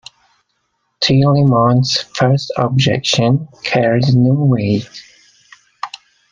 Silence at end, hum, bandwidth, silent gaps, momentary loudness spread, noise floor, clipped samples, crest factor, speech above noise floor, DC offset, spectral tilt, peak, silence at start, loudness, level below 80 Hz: 0.45 s; none; 7.4 kHz; none; 13 LU; -67 dBFS; under 0.1%; 14 dB; 54 dB; under 0.1%; -6 dB/octave; 0 dBFS; 1 s; -14 LUFS; -50 dBFS